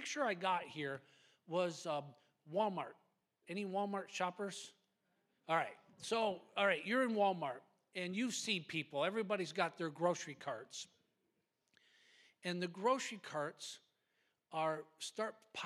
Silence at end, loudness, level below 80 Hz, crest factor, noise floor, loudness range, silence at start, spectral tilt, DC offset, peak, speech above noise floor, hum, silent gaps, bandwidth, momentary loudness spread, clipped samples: 0 s; -40 LUFS; under -90 dBFS; 22 dB; -84 dBFS; 6 LU; 0 s; -4 dB/octave; under 0.1%; -20 dBFS; 44 dB; none; none; 14.5 kHz; 14 LU; under 0.1%